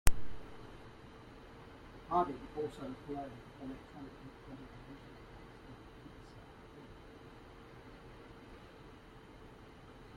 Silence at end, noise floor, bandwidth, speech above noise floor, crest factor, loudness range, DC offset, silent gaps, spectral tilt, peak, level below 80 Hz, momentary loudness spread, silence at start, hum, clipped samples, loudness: 0 s; -56 dBFS; 16 kHz; 14 dB; 32 dB; 13 LU; under 0.1%; none; -5 dB/octave; -8 dBFS; -48 dBFS; 17 LU; 0.05 s; none; under 0.1%; -47 LUFS